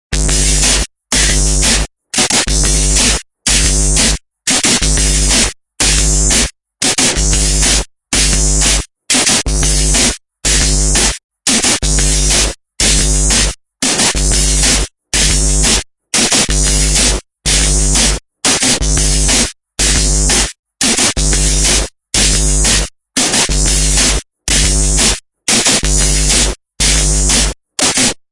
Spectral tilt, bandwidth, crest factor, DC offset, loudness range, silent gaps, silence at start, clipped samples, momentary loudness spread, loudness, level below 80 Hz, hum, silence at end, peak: -2 dB/octave; 11.5 kHz; 12 dB; under 0.1%; 1 LU; 11.24-11.29 s, 20.59-20.63 s; 0.1 s; under 0.1%; 5 LU; -11 LUFS; -18 dBFS; none; 0.15 s; 0 dBFS